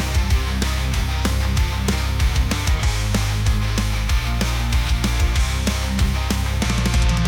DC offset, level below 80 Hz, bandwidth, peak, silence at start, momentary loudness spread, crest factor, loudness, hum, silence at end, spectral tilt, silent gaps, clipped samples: under 0.1%; -20 dBFS; 18.5 kHz; -6 dBFS; 0 s; 2 LU; 12 dB; -21 LUFS; none; 0 s; -4.5 dB/octave; none; under 0.1%